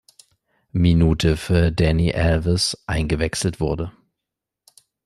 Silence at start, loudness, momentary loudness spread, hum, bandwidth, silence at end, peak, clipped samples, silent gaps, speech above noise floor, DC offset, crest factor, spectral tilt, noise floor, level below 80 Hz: 0.75 s; -20 LUFS; 8 LU; none; 12.5 kHz; 1.15 s; -4 dBFS; under 0.1%; none; 65 dB; under 0.1%; 16 dB; -5.5 dB/octave; -84 dBFS; -34 dBFS